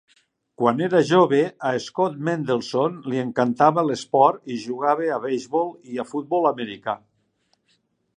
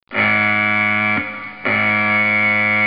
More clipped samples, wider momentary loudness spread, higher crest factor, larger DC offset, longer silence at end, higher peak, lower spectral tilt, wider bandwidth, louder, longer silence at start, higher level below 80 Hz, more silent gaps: neither; first, 11 LU vs 6 LU; first, 20 dB vs 14 dB; second, under 0.1% vs 0.3%; first, 1.2 s vs 0 s; about the same, -2 dBFS vs -4 dBFS; second, -6 dB/octave vs -10 dB/octave; first, 10 kHz vs 5.4 kHz; second, -22 LUFS vs -15 LUFS; first, 0.6 s vs 0.1 s; second, -72 dBFS vs -58 dBFS; neither